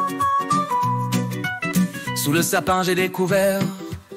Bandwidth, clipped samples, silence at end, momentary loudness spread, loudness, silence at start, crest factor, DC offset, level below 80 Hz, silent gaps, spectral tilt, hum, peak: 16 kHz; under 0.1%; 0 s; 6 LU; -21 LUFS; 0 s; 14 dB; under 0.1%; -52 dBFS; none; -4.5 dB/octave; none; -6 dBFS